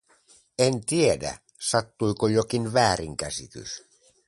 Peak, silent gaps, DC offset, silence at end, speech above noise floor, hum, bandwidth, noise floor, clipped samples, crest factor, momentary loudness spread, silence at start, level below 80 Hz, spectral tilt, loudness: -6 dBFS; none; under 0.1%; 0.5 s; 34 dB; none; 11.5 kHz; -59 dBFS; under 0.1%; 20 dB; 15 LU; 0.6 s; -52 dBFS; -4.5 dB/octave; -25 LUFS